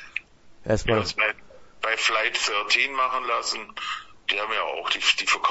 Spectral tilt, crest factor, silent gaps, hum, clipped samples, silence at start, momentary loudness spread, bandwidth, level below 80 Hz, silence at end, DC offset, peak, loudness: -2 dB/octave; 20 dB; none; none; under 0.1%; 0 s; 11 LU; 8.2 kHz; -48 dBFS; 0 s; under 0.1%; -6 dBFS; -24 LUFS